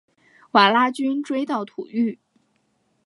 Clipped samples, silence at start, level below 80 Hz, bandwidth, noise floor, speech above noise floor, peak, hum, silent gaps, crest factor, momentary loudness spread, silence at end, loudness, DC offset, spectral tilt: under 0.1%; 0.55 s; -78 dBFS; 11.5 kHz; -68 dBFS; 47 dB; -2 dBFS; none; none; 22 dB; 11 LU; 0.9 s; -21 LUFS; under 0.1%; -5 dB/octave